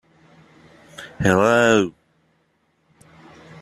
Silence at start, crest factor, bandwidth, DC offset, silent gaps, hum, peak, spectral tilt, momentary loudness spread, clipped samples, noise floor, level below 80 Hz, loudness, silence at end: 1 s; 20 dB; 14 kHz; under 0.1%; none; none; -2 dBFS; -5 dB/octave; 23 LU; under 0.1%; -65 dBFS; -52 dBFS; -17 LUFS; 1.7 s